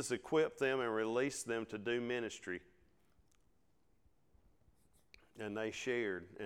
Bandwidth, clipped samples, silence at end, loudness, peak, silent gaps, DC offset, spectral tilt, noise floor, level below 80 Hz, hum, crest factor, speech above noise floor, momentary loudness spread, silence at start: 16 kHz; under 0.1%; 0 s; -39 LUFS; -24 dBFS; none; under 0.1%; -4 dB/octave; -77 dBFS; -74 dBFS; none; 18 dB; 39 dB; 10 LU; 0 s